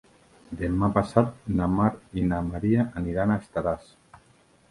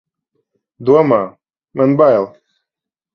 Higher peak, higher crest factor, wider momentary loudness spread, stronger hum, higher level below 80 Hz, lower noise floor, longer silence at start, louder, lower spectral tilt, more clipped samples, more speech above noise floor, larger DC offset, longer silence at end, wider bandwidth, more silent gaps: second, -4 dBFS vs 0 dBFS; first, 24 dB vs 16 dB; second, 7 LU vs 16 LU; neither; first, -44 dBFS vs -60 dBFS; second, -59 dBFS vs -85 dBFS; second, 0.5 s vs 0.8 s; second, -26 LUFS vs -13 LUFS; about the same, -9 dB/octave vs -9.5 dB/octave; neither; second, 34 dB vs 73 dB; neither; about the same, 0.9 s vs 0.85 s; first, 11.5 kHz vs 6.4 kHz; neither